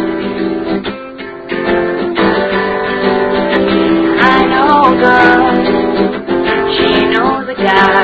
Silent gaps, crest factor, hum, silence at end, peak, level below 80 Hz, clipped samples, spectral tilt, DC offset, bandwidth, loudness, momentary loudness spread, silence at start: none; 12 dB; none; 0 s; 0 dBFS; -38 dBFS; 0.3%; -7 dB/octave; under 0.1%; 8 kHz; -11 LUFS; 9 LU; 0 s